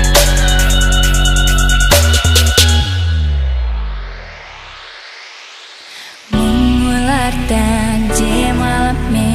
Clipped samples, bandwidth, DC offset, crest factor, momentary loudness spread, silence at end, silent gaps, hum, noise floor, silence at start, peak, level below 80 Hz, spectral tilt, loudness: under 0.1%; 15.5 kHz; under 0.1%; 12 dB; 21 LU; 0 s; none; none; -34 dBFS; 0 s; 0 dBFS; -16 dBFS; -4 dB/octave; -13 LUFS